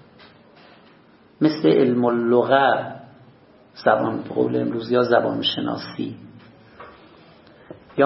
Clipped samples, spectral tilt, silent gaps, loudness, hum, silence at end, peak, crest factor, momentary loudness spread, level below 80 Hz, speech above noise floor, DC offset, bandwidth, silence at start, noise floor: under 0.1%; -9.5 dB/octave; none; -20 LUFS; none; 0 s; -2 dBFS; 20 dB; 14 LU; -64 dBFS; 33 dB; under 0.1%; 5.8 kHz; 1.4 s; -52 dBFS